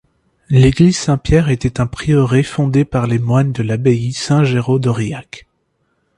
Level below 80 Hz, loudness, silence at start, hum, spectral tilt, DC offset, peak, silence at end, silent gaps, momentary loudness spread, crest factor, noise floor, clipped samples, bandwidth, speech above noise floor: -34 dBFS; -15 LUFS; 0.5 s; none; -7 dB/octave; under 0.1%; 0 dBFS; 0.8 s; none; 7 LU; 14 dB; -65 dBFS; under 0.1%; 11 kHz; 51 dB